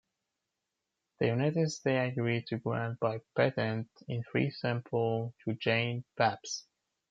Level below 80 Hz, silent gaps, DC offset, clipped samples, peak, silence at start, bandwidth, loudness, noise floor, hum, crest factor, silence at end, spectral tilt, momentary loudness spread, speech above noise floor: -74 dBFS; none; under 0.1%; under 0.1%; -12 dBFS; 1.2 s; 7.8 kHz; -33 LUFS; -87 dBFS; none; 20 dB; 0.5 s; -6 dB/octave; 8 LU; 55 dB